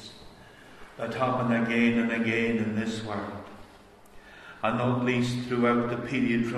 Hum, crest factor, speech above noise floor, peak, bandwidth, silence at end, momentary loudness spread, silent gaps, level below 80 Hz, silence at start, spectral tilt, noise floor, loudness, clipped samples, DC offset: none; 18 dB; 26 dB; -10 dBFS; 11 kHz; 0 s; 18 LU; none; -58 dBFS; 0 s; -6.5 dB/octave; -53 dBFS; -27 LUFS; under 0.1%; under 0.1%